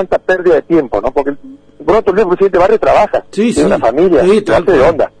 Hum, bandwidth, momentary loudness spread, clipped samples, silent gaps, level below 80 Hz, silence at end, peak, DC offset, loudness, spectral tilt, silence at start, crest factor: none; 10.5 kHz; 6 LU; under 0.1%; none; -34 dBFS; 0.1 s; -2 dBFS; under 0.1%; -11 LUFS; -6 dB/octave; 0 s; 10 dB